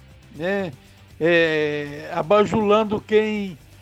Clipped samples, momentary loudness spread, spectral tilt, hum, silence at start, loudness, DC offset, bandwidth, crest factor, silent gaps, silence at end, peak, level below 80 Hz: under 0.1%; 11 LU; -6 dB/octave; none; 0.35 s; -21 LUFS; under 0.1%; 13.5 kHz; 18 dB; none; 0.25 s; -4 dBFS; -52 dBFS